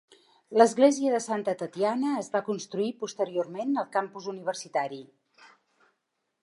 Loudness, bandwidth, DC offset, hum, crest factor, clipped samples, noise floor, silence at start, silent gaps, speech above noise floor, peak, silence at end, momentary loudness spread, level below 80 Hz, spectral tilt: -28 LUFS; 11.5 kHz; under 0.1%; none; 22 dB; under 0.1%; -80 dBFS; 0.5 s; none; 53 dB; -6 dBFS; 1.4 s; 12 LU; -84 dBFS; -4.5 dB/octave